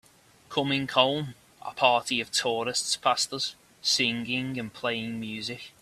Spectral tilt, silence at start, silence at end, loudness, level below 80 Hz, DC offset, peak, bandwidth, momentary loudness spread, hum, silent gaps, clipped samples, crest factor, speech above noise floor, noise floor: -2.5 dB/octave; 0.5 s; 0.1 s; -27 LUFS; -68 dBFS; under 0.1%; -4 dBFS; 15 kHz; 11 LU; none; none; under 0.1%; 24 dB; 25 dB; -53 dBFS